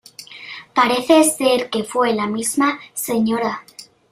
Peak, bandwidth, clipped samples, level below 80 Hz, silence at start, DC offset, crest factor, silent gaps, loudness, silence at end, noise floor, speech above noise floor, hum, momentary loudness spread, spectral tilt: -2 dBFS; 16 kHz; under 0.1%; -62 dBFS; 0.2 s; under 0.1%; 18 dB; none; -18 LUFS; 0.3 s; -38 dBFS; 21 dB; none; 19 LU; -3 dB/octave